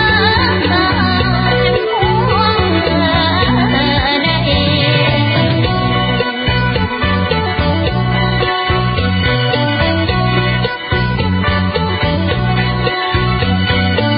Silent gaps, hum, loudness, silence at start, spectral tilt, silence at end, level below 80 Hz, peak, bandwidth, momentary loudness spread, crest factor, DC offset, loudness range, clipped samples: none; none; -13 LUFS; 0 s; -11.5 dB/octave; 0 s; -24 dBFS; 0 dBFS; 5.2 kHz; 3 LU; 12 dB; under 0.1%; 2 LU; under 0.1%